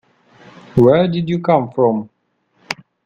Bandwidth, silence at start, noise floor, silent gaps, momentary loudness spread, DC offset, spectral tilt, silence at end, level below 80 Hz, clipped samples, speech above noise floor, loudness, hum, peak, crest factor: 7.8 kHz; 0.75 s; -63 dBFS; none; 16 LU; under 0.1%; -8 dB/octave; 0.3 s; -50 dBFS; under 0.1%; 49 dB; -15 LUFS; none; 0 dBFS; 18 dB